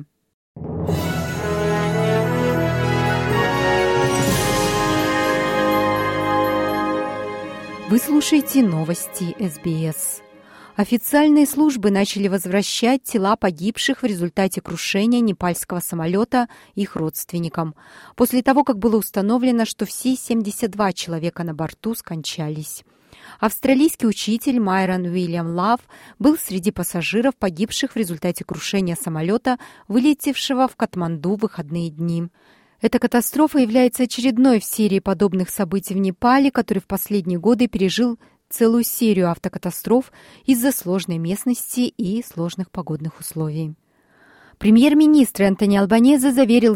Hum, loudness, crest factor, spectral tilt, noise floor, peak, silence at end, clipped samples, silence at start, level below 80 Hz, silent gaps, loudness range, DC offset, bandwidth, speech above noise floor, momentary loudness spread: none; -19 LUFS; 14 dB; -5 dB/octave; -55 dBFS; -4 dBFS; 0 s; under 0.1%; 0 s; -48 dBFS; 0.34-0.55 s; 4 LU; under 0.1%; 16.5 kHz; 36 dB; 11 LU